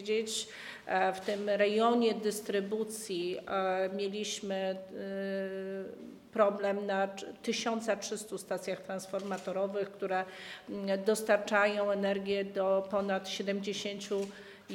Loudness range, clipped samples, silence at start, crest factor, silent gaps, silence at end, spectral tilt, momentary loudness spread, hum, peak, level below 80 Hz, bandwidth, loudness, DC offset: 4 LU; under 0.1%; 0 s; 20 dB; none; 0 s; -4 dB/octave; 11 LU; none; -14 dBFS; -76 dBFS; 17.5 kHz; -33 LUFS; under 0.1%